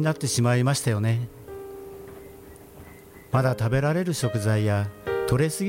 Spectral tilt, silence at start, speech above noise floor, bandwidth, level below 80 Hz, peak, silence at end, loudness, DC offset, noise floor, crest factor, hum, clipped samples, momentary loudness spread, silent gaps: -5.5 dB/octave; 0 s; 23 dB; 16.5 kHz; -50 dBFS; -8 dBFS; 0 s; -24 LUFS; under 0.1%; -46 dBFS; 16 dB; none; under 0.1%; 23 LU; none